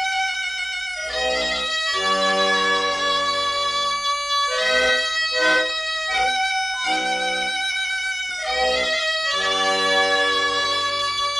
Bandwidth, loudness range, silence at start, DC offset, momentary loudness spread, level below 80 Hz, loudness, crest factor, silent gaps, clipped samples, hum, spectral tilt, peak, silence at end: 14.5 kHz; 2 LU; 0 s; under 0.1%; 5 LU; -52 dBFS; -20 LUFS; 14 dB; none; under 0.1%; none; -0.5 dB/octave; -8 dBFS; 0 s